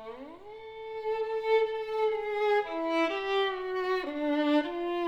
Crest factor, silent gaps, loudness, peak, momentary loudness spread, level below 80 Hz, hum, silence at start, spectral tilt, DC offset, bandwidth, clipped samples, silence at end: 14 dB; none; -30 LUFS; -16 dBFS; 16 LU; -64 dBFS; none; 0 s; -4 dB/octave; under 0.1%; 8.4 kHz; under 0.1%; 0 s